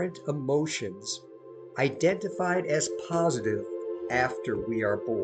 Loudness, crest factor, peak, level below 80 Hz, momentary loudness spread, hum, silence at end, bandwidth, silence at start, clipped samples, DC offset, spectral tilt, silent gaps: -29 LUFS; 18 dB; -12 dBFS; -62 dBFS; 9 LU; none; 0 s; 9.4 kHz; 0 s; under 0.1%; under 0.1%; -4.5 dB/octave; none